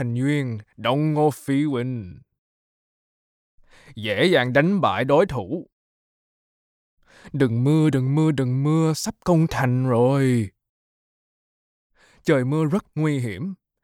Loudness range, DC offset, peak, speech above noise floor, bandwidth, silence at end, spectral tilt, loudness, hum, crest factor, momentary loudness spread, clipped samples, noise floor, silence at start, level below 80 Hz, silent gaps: 5 LU; under 0.1%; -6 dBFS; over 69 dB; 15.5 kHz; 0.3 s; -7 dB/octave; -21 LUFS; none; 18 dB; 12 LU; under 0.1%; under -90 dBFS; 0 s; -54 dBFS; 2.38-3.58 s, 5.72-6.98 s, 10.69-11.90 s